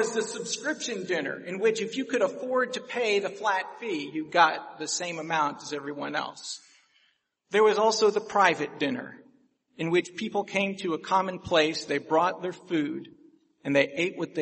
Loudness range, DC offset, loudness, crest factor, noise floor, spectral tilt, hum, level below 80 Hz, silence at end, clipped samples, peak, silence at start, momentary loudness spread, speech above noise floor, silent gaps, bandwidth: 3 LU; under 0.1%; -27 LUFS; 22 dB; -70 dBFS; -3.5 dB/octave; none; -70 dBFS; 0 s; under 0.1%; -6 dBFS; 0 s; 11 LU; 43 dB; none; 8.8 kHz